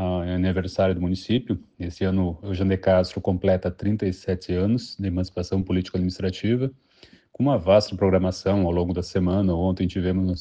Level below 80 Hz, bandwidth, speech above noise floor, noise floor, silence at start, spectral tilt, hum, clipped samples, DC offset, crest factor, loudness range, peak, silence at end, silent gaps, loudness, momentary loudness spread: -44 dBFS; 8.2 kHz; 31 dB; -54 dBFS; 0 s; -8 dB/octave; none; under 0.1%; under 0.1%; 18 dB; 3 LU; -6 dBFS; 0 s; none; -24 LUFS; 7 LU